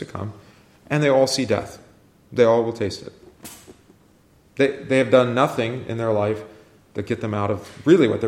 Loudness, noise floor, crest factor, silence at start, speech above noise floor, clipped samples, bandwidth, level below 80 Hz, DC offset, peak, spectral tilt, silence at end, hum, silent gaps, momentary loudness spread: -21 LUFS; -55 dBFS; 18 dB; 0 s; 35 dB; under 0.1%; 16 kHz; -58 dBFS; under 0.1%; -4 dBFS; -6 dB/octave; 0 s; none; none; 21 LU